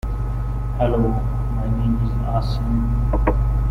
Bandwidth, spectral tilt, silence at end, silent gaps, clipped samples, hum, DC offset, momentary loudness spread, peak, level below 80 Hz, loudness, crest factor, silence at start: 5.2 kHz; -9.5 dB/octave; 0 s; none; under 0.1%; 50 Hz at -25 dBFS; under 0.1%; 6 LU; -4 dBFS; -22 dBFS; -22 LUFS; 14 dB; 0.05 s